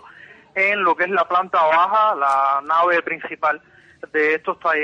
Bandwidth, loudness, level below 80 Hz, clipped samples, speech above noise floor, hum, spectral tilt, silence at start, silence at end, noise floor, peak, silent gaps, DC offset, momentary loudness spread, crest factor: 10 kHz; -18 LUFS; -66 dBFS; under 0.1%; 26 dB; none; -4.5 dB/octave; 0.05 s; 0 s; -45 dBFS; -8 dBFS; none; under 0.1%; 7 LU; 12 dB